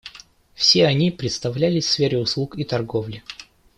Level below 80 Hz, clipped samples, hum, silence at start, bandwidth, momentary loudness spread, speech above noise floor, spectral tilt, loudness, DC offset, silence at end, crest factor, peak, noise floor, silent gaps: -54 dBFS; under 0.1%; none; 0.05 s; 12 kHz; 20 LU; 27 dB; -5 dB/octave; -20 LUFS; under 0.1%; 0.35 s; 18 dB; -2 dBFS; -47 dBFS; none